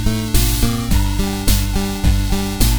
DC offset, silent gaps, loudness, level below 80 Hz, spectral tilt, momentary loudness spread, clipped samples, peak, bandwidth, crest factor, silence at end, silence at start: under 0.1%; none; -18 LUFS; -18 dBFS; -4.5 dB/octave; 3 LU; under 0.1%; 0 dBFS; over 20 kHz; 16 dB; 0 s; 0 s